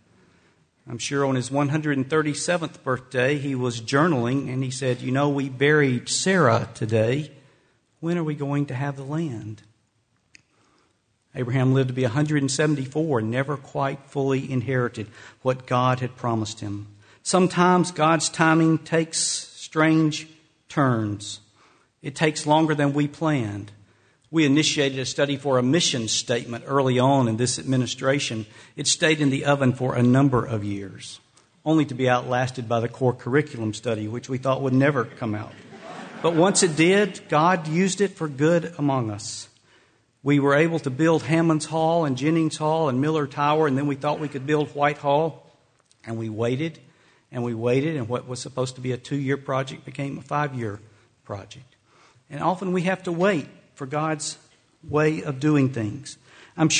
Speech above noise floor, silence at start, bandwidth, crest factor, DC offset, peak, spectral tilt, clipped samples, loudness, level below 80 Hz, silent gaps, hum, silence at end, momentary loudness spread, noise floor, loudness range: 45 dB; 0.85 s; 9.6 kHz; 20 dB; under 0.1%; -4 dBFS; -5 dB/octave; under 0.1%; -23 LUFS; -60 dBFS; none; none; 0 s; 13 LU; -68 dBFS; 6 LU